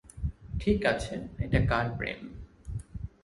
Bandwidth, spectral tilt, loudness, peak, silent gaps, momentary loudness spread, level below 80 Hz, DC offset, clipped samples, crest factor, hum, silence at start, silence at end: 11.5 kHz; -6.5 dB/octave; -31 LUFS; -10 dBFS; none; 16 LU; -40 dBFS; under 0.1%; under 0.1%; 22 dB; none; 0.05 s; 0.15 s